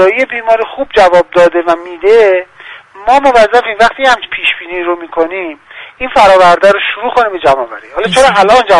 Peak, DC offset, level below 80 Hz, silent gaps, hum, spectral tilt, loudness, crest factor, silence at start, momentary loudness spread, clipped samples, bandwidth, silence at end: 0 dBFS; under 0.1%; -40 dBFS; none; none; -3.5 dB/octave; -9 LUFS; 8 dB; 0 s; 10 LU; 0.9%; 11.5 kHz; 0 s